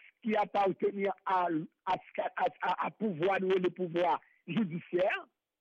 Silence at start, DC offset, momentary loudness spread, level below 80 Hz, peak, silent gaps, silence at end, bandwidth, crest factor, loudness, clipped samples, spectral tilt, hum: 0.25 s; under 0.1%; 6 LU; -74 dBFS; -22 dBFS; none; 0.35 s; 7.2 kHz; 12 dB; -33 LUFS; under 0.1%; -7.5 dB/octave; none